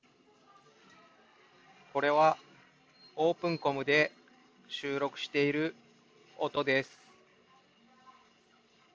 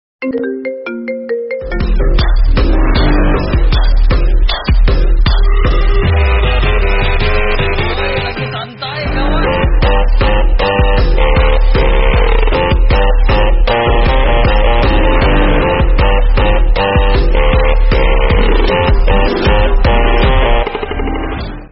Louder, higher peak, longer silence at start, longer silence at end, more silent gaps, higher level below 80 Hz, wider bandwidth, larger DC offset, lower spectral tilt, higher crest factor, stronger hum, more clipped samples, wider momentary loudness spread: second, -31 LUFS vs -13 LUFS; second, -12 dBFS vs 0 dBFS; first, 1.95 s vs 0.2 s; first, 2.1 s vs 0.05 s; neither; second, -80 dBFS vs -10 dBFS; first, 7.8 kHz vs 5.8 kHz; neither; about the same, -5 dB/octave vs -4.5 dB/octave; first, 22 dB vs 10 dB; neither; neither; first, 12 LU vs 7 LU